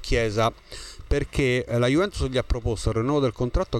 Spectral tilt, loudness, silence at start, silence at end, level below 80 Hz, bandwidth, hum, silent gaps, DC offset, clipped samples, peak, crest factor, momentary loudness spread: -6 dB/octave; -24 LUFS; 0 s; 0 s; -32 dBFS; 13 kHz; none; none; under 0.1%; under 0.1%; -8 dBFS; 16 dB; 6 LU